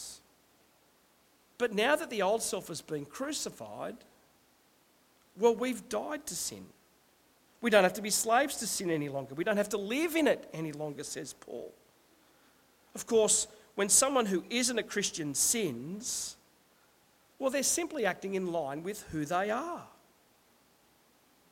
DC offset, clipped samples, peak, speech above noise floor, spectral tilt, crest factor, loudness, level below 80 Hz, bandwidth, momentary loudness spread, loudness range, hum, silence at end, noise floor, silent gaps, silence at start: under 0.1%; under 0.1%; -10 dBFS; 35 dB; -2.5 dB/octave; 24 dB; -31 LUFS; -68 dBFS; 16.5 kHz; 16 LU; 7 LU; none; 1.65 s; -67 dBFS; none; 0 s